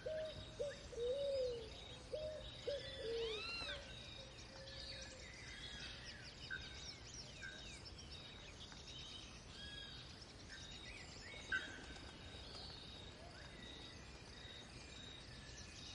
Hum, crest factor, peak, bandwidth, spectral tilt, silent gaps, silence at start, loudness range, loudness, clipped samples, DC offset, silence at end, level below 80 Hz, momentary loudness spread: none; 20 dB; -30 dBFS; 11.5 kHz; -3 dB/octave; none; 0 s; 8 LU; -50 LUFS; under 0.1%; under 0.1%; 0 s; -62 dBFS; 10 LU